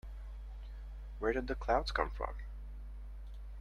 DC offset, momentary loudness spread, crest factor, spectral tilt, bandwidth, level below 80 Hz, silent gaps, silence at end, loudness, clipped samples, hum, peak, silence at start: under 0.1%; 16 LU; 24 dB; -6 dB/octave; 9.6 kHz; -44 dBFS; none; 0 s; -37 LUFS; under 0.1%; none; -16 dBFS; 0.05 s